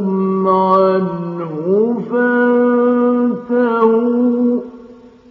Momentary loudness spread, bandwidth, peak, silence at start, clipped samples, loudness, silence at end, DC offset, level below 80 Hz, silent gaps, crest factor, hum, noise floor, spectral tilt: 9 LU; 4.7 kHz; 0 dBFS; 0 s; under 0.1%; -15 LUFS; 0.35 s; under 0.1%; -62 dBFS; none; 14 dB; none; -39 dBFS; -7 dB/octave